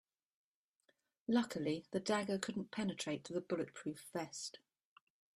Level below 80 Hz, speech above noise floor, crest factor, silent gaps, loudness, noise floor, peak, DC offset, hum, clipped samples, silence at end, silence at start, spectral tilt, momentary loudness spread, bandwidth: -80 dBFS; 40 dB; 22 dB; none; -41 LUFS; -81 dBFS; -22 dBFS; under 0.1%; none; under 0.1%; 0.8 s; 1.3 s; -4.5 dB/octave; 9 LU; 13.5 kHz